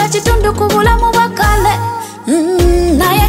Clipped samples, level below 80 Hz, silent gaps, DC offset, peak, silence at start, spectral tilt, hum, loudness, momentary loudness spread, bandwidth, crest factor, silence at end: under 0.1%; -18 dBFS; none; under 0.1%; 0 dBFS; 0 s; -5 dB/octave; none; -12 LUFS; 6 LU; 16.5 kHz; 10 dB; 0 s